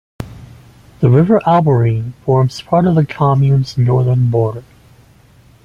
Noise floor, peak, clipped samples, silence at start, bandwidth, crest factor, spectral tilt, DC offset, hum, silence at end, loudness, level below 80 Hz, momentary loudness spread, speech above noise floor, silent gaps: -46 dBFS; -2 dBFS; under 0.1%; 0.2 s; 7.2 kHz; 12 dB; -9 dB/octave; under 0.1%; none; 1.05 s; -13 LUFS; -44 dBFS; 9 LU; 34 dB; none